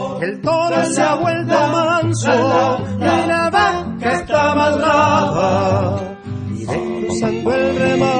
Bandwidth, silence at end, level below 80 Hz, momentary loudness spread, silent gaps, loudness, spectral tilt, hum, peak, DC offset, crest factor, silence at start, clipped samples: 10 kHz; 0 s; -46 dBFS; 8 LU; none; -16 LUFS; -5.5 dB/octave; none; 0 dBFS; under 0.1%; 16 dB; 0 s; under 0.1%